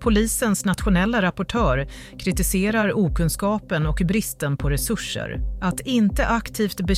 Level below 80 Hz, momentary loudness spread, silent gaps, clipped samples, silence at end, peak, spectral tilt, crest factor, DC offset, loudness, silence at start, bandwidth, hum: -30 dBFS; 6 LU; none; under 0.1%; 0 s; -8 dBFS; -5 dB/octave; 14 dB; under 0.1%; -22 LUFS; 0 s; 16 kHz; none